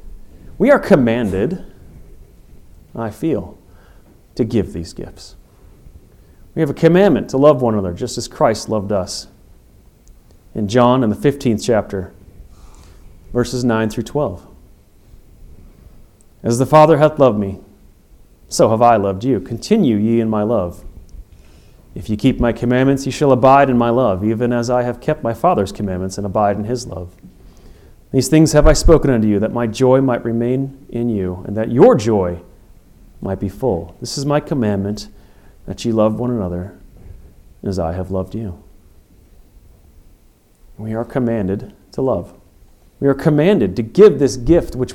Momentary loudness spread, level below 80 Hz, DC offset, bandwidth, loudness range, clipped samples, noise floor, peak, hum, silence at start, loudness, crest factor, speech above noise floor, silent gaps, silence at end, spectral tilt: 16 LU; -32 dBFS; under 0.1%; 16.5 kHz; 10 LU; under 0.1%; -50 dBFS; 0 dBFS; none; 0.05 s; -16 LUFS; 16 dB; 35 dB; none; 0 s; -6.5 dB/octave